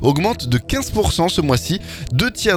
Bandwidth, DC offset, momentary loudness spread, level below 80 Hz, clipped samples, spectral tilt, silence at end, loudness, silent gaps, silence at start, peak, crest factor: 19 kHz; under 0.1%; 6 LU; -32 dBFS; under 0.1%; -5 dB/octave; 0 s; -19 LUFS; none; 0 s; 0 dBFS; 18 dB